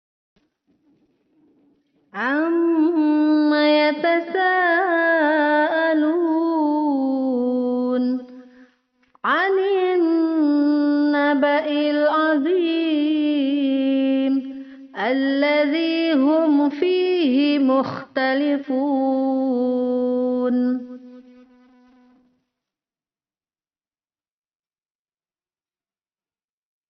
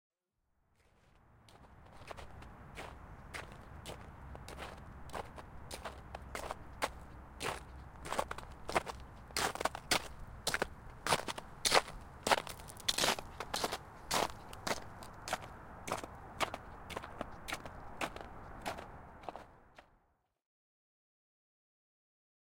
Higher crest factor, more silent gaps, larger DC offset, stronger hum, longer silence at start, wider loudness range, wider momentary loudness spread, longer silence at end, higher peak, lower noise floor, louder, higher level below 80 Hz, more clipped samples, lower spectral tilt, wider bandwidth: second, 12 dB vs 32 dB; neither; neither; neither; first, 2.15 s vs 1.05 s; second, 5 LU vs 17 LU; second, 5 LU vs 18 LU; first, 5.7 s vs 2.7 s; about the same, -8 dBFS vs -10 dBFS; first, under -90 dBFS vs -81 dBFS; first, -19 LUFS vs -39 LUFS; second, -72 dBFS vs -56 dBFS; neither; about the same, -1.5 dB/octave vs -2 dB/octave; second, 5.8 kHz vs 17 kHz